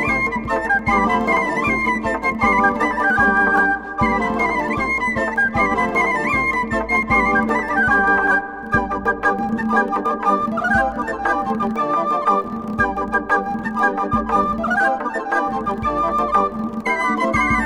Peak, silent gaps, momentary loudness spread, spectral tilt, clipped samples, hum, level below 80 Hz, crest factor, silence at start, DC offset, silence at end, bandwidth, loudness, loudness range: -2 dBFS; none; 6 LU; -6 dB/octave; under 0.1%; none; -38 dBFS; 16 dB; 0 s; under 0.1%; 0 s; 13.5 kHz; -18 LUFS; 3 LU